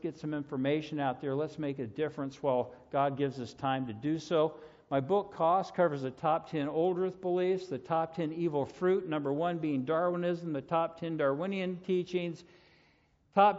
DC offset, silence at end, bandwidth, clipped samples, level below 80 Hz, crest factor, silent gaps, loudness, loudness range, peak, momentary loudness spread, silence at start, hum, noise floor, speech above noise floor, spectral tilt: under 0.1%; 0 s; 7.6 kHz; under 0.1%; -72 dBFS; 20 dB; none; -33 LUFS; 3 LU; -12 dBFS; 6 LU; 0.05 s; none; -68 dBFS; 36 dB; -5.5 dB/octave